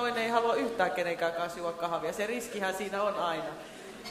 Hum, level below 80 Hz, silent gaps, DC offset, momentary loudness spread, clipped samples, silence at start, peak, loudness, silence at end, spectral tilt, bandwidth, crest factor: none; -66 dBFS; none; under 0.1%; 10 LU; under 0.1%; 0 s; -12 dBFS; -32 LUFS; 0 s; -3.5 dB/octave; 15.5 kHz; 20 dB